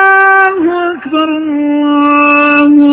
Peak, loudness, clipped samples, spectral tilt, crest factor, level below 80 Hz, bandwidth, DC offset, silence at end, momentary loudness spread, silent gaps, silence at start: 0 dBFS; -8 LUFS; 0.9%; -7.5 dB/octave; 8 dB; -52 dBFS; 4 kHz; under 0.1%; 0 s; 8 LU; none; 0 s